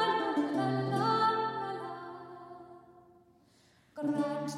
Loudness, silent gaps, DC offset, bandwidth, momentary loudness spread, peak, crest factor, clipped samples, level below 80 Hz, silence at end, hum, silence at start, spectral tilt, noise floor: -32 LUFS; none; under 0.1%; 12.5 kHz; 22 LU; -16 dBFS; 16 dB; under 0.1%; -78 dBFS; 0 s; none; 0 s; -6 dB/octave; -65 dBFS